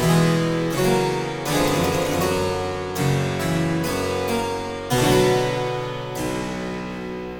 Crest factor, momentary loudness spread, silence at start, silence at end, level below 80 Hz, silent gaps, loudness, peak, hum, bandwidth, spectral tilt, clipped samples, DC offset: 18 dB; 10 LU; 0 s; 0 s; -42 dBFS; none; -22 LUFS; -4 dBFS; none; 18 kHz; -5 dB/octave; under 0.1%; under 0.1%